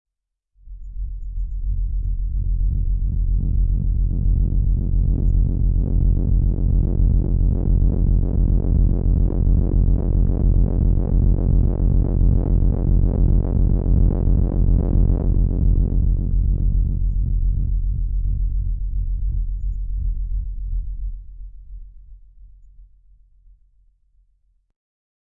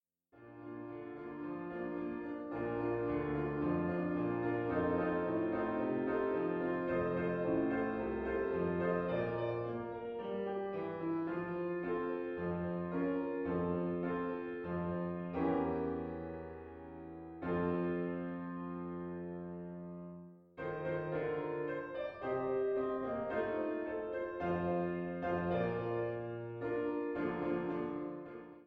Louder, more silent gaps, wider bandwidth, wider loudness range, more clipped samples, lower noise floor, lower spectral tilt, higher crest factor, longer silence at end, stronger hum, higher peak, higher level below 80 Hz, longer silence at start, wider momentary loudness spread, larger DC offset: first, -21 LUFS vs -38 LUFS; neither; second, 1.3 kHz vs 5.2 kHz; first, 9 LU vs 5 LU; neither; first, -73 dBFS vs -61 dBFS; first, -15 dB/octave vs -10.5 dB/octave; about the same, 12 dB vs 16 dB; first, 2.45 s vs 0 s; neither; first, -6 dBFS vs -20 dBFS; first, -20 dBFS vs -62 dBFS; first, 0.65 s vs 0.35 s; about the same, 10 LU vs 11 LU; neither